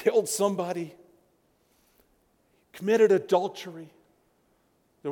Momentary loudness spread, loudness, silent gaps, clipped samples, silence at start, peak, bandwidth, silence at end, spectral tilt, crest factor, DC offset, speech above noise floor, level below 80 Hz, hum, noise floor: 20 LU; -26 LUFS; none; under 0.1%; 0 s; -10 dBFS; 18.5 kHz; 0 s; -4.5 dB/octave; 20 dB; under 0.1%; 43 dB; -76 dBFS; none; -68 dBFS